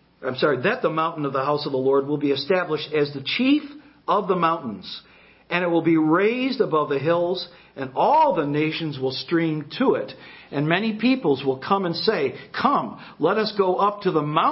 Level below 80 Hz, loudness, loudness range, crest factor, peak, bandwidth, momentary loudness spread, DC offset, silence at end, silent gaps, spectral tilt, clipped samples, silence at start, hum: -64 dBFS; -22 LUFS; 2 LU; 20 dB; -4 dBFS; 5.8 kHz; 10 LU; under 0.1%; 0 s; none; -10 dB/octave; under 0.1%; 0.2 s; none